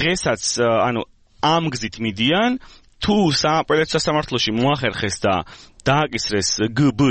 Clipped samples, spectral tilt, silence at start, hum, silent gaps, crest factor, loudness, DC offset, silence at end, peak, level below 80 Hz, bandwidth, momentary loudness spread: under 0.1%; -4 dB/octave; 0 s; none; none; 18 dB; -19 LUFS; under 0.1%; 0 s; -2 dBFS; -46 dBFS; 8.8 kHz; 8 LU